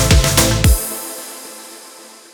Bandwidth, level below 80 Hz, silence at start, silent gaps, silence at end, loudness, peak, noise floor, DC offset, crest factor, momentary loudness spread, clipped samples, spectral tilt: over 20 kHz; -20 dBFS; 0 s; none; 0.3 s; -15 LUFS; 0 dBFS; -39 dBFS; under 0.1%; 16 dB; 23 LU; under 0.1%; -3.5 dB/octave